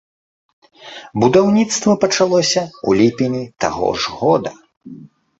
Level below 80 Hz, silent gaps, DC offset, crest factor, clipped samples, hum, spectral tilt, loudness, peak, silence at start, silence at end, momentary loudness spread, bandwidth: -50 dBFS; 4.77-4.81 s; under 0.1%; 18 dB; under 0.1%; none; -4.5 dB/octave; -16 LUFS; 0 dBFS; 0.8 s; 0.35 s; 10 LU; 8.2 kHz